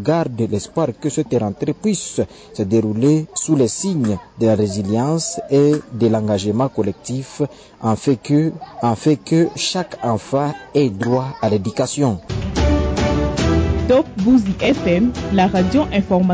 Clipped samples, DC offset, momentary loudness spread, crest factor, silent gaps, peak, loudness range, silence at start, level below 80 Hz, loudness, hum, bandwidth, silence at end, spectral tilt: under 0.1%; under 0.1%; 7 LU; 12 dB; none; -6 dBFS; 3 LU; 0 s; -32 dBFS; -18 LUFS; none; 8 kHz; 0 s; -6 dB/octave